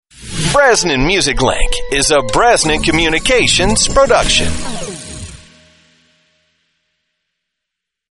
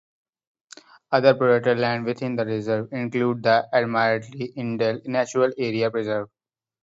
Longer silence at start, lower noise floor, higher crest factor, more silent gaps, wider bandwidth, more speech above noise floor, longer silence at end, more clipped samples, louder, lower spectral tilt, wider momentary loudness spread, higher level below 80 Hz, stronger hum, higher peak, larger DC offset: second, 0.2 s vs 1.1 s; first, -79 dBFS vs -49 dBFS; second, 14 dB vs 20 dB; neither; first, 11.5 kHz vs 7.8 kHz; first, 68 dB vs 27 dB; first, 2.75 s vs 0.55 s; neither; first, -12 LUFS vs -23 LUFS; second, -2.5 dB/octave vs -6 dB/octave; first, 15 LU vs 9 LU; first, -26 dBFS vs -68 dBFS; neither; first, 0 dBFS vs -4 dBFS; neither